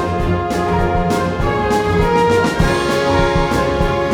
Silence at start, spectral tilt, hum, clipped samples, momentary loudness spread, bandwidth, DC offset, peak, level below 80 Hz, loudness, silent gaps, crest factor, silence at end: 0 s; -6 dB/octave; none; under 0.1%; 4 LU; 18.5 kHz; under 0.1%; -2 dBFS; -26 dBFS; -16 LUFS; none; 14 dB; 0 s